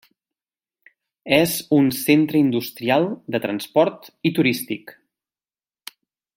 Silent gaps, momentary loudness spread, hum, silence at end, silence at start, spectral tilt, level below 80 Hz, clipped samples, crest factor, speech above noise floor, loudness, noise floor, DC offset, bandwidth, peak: none; 22 LU; none; 1.45 s; 1.25 s; -5 dB/octave; -64 dBFS; under 0.1%; 20 dB; over 70 dB; -20 LUFS; under -90 dBFS; under 0.1%; 16.5 kHz; -2 dBFS